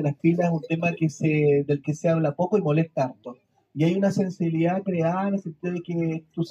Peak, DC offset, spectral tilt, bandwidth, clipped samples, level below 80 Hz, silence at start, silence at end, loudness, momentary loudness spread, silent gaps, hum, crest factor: -8 dBFS; under 0.1%; -8 dB/octave; 8.2 kHz; under 0.1%; -68 dBFS; 0 s; 0 s; -24 LUFS; 8 LU; none; none; 16 dB